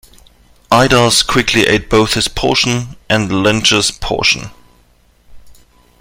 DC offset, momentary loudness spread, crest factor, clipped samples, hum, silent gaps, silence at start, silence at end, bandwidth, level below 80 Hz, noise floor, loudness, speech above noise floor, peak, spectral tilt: under 0.1%; 7 LU; 14 dB; under 0.1%; 60 Hz at -40 dBFS; none; 0.7 s; 0.45 s; 17 kHz; -34 dBFS; -51 dBFS; -12 LUFS; 38 dB; 0 dBFS; -3.5 dB/octave